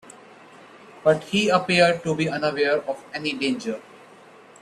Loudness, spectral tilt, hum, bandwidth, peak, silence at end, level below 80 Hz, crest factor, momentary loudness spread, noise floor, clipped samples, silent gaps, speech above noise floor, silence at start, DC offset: -22 LUFS; -5 dB/octave; none; 13 kHz; -4 dBFS; 0.8 s; -64 dBFS; 20 dB; 11 LU; -48 dBFS; under 0.1%; none; 26 dB; 0.05 s; under 0.1%